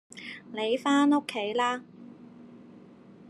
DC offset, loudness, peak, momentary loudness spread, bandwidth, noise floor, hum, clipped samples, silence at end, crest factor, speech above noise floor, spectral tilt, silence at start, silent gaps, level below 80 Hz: under 0.1%; -27 LUFS; -14 dBFS; 26 LU; 12 kHz; -51 dBFS; none; under 0.1%; 0.05 s; 16 dB; 25 dB; -4 dB/octave; 0.15 s; none; -80 dBFS